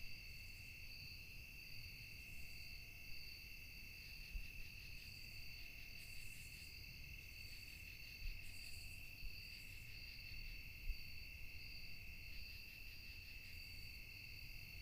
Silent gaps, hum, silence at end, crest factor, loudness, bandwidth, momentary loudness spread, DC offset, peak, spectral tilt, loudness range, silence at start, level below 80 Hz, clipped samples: none; none; 0 s; 20 dB; -54 LUFS; 15.5 kHz; 2 LU; under 0.1%; -32 dBFS; -2.5 dB/octave; 1 LU; 0 s; -58 dBFS; under 0.1%